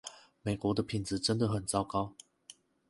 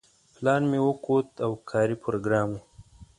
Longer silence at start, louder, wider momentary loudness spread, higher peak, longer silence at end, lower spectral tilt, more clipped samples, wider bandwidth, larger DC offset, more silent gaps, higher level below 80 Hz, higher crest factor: second, 0.05 s vs 0.4 s; second, -34 LUFS vs -26 LUFS; first, 16 LU vs 8 LU; second, -14 dBFS vs -10 dBFS; first, 0.35 s vs 0.15 s; second, -5 dB/octave vs -7.5 dB/octave; neither; about the same, 11.5 kHz vs 11 kHz; neither; neither; about the same, -58 dBFS vs -58 dBFS; about the same, 20 dB vs 18 dB